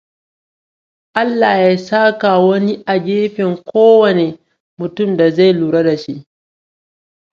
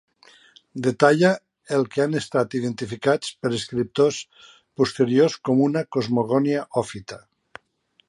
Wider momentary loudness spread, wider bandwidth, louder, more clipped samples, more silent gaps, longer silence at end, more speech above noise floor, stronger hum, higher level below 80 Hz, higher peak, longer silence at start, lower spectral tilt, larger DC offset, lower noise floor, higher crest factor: about the same, 12 LU vs 14 LU; second, 7.2 kHz vs 11.5 kHz; first, -13 LUFS vs -22 LUFS; neither; first, 4.60-4.77 s vs none; first, 1.15 s vs 0.9 s; first, over 78 dB vs 43 dB; neither; about the same, -62 dBFS vs -62 dBFS; about the same, 0 dBFS vs -2 dBFS; first, 1.15 s vs 0.75 s; first, -7.5 dB/octave vs -6 dB/octave; neither; first, under -90 dBFS vs -64 dBFS; second, 14 dB vs 22 dB